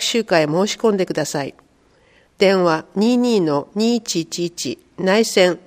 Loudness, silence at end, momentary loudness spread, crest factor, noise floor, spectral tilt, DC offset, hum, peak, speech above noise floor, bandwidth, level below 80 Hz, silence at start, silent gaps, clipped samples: -18 LUFS; 0.05 s; 9 LU; 18 dB; -55 dBFS; -4.5 dB/octave; under 0.1%; none; 0 dBFS; 38 dB; 15.5 kHz; -62 dBFS; 0 s; none; under 0.1%